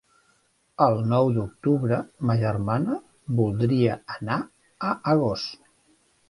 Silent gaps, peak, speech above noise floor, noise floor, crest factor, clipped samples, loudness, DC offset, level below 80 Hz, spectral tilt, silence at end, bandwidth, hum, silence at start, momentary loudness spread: none; -4 dBFS; 42 dB; -66 dBFS; 20 dB; under 0.1%; -25 LUFS; under 0.1%; -54 dBFS; -8.5 dB/octave; 0.75 s; 11.5 kHz; none; 0.8 s; 10 LU